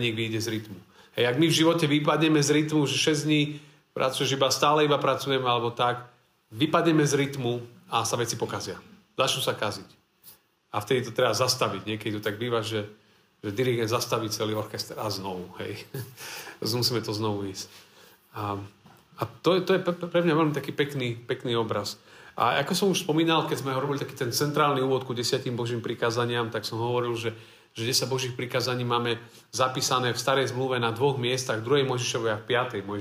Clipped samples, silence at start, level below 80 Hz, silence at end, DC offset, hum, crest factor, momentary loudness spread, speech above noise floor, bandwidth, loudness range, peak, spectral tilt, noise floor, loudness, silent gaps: under 0.1%; 0 s; -70 dBFS; 0 s; under 0.1%; none; 18 dB; 14 LU; 29 dB; 16 kHz; 7 LU; -8 dBFS; -4.5 dB/octave; -55 dBFS; -26 LUFS; none